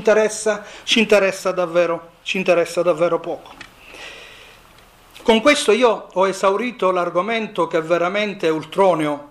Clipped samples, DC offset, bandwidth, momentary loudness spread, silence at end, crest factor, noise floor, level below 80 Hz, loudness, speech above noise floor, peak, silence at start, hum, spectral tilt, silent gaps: under 0.1%; under 0.1%; 14.5 kHz; 12 LU; 0.05 s; 16 dB; -48 dBFS; -56 dBFS; -18 LUFS; 30 dB; -4 dBFS; 0 s; none; -4 dB/octave; none